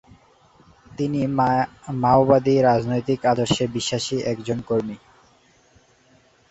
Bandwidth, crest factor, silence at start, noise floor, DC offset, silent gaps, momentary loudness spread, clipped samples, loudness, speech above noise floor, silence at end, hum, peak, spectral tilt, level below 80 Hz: 8.2 kHz; 20 dB; 0.9 s; -57 dBFS; under 0.1%; none; 11 LU; under 0.1%; -21 LUFS; 37 dB; 1.55 s; none; -2 dBFS; -5.5 dB/octave; -52 dBFS